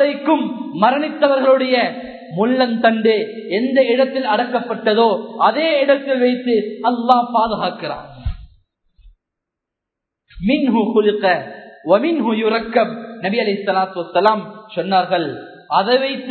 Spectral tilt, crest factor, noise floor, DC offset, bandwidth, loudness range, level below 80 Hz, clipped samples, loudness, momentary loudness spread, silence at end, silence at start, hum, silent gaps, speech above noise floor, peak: -8 dB/octave; 18 dB; -82 dBFS; under 0.1%; 4.6 kHz; 5 LU; -44 dBFS; under 0.1%; -17 LUFS; 10 LU; 0 s; 0 s; none; none; 66 dB; 0 dBFS